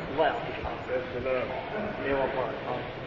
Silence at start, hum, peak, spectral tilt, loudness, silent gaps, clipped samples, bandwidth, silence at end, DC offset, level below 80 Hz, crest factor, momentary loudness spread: 0 s; none; -14 dBFS; -7 dB/octave; -31 LUFS; none; under 0.1%; 7.2 kHz; 0 s; under 0.1%; -50 dBFS; 18 dB; 6 LU